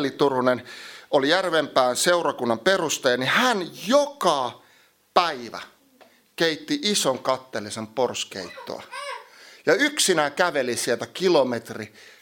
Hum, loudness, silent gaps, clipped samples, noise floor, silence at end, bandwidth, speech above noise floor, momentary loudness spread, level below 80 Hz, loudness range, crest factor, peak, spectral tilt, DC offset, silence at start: none; -22 LUFS; none; under 0.1%; -58 dBFS; 0.35 s; 17 kHz; 35 dB; 15 LU; -72 dBFS; 5 LU; 22 dB; -2 dBFS; -3 dB/octave; under 0.1%; 0 s